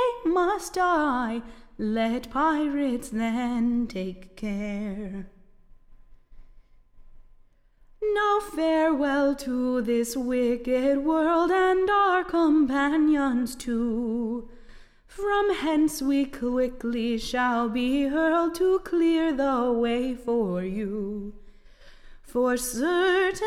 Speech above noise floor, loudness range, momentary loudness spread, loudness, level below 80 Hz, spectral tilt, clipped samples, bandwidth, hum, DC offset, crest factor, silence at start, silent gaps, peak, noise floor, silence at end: 32 dB; 9 LU; 10 LU; -25 LUFS; -48 dBFS; -5 dB/octave; under 0.1%; 16 kHz; none; under 0.1%; 14 dB; 0 s; none; -12 dBFS; -57 dBFS; 0 s